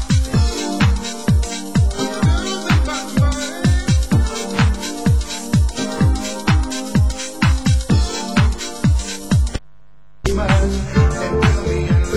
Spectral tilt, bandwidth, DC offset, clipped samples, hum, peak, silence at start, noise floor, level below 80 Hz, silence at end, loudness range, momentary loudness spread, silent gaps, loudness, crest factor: -5.5 dB/octave; 16 kHz; 2%; under 0.1%; none; 0 dBFS; 0 s; -53 dBFS; -20 dBFS; 0 s; 1 LU; 4 LU; none; -18 LUFS; 16 dB